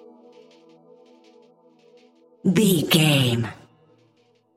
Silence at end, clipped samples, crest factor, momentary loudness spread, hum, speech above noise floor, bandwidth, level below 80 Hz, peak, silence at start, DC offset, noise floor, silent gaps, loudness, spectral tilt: 1.05 s; under 0.1%; 20 dB; 10 LU; none; 43 dB; 16 kHz; -64 dBFS; -4 dBFS; 2.45 s; under 0.1%; -62 dBFS; none; -20 LUFS; -5 dB/octave